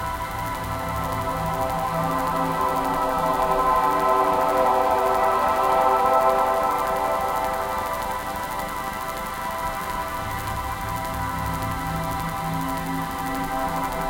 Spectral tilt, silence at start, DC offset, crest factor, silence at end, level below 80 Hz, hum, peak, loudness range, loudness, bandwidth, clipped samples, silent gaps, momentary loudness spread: -5 dB/octave; 0 s; under 0.1%; 16 dB; 0 s; -40 dBFS; none; -6 dBFS; 8 LU; -23 LUFS; 17 kHz; under 0.1%; none; 8 LU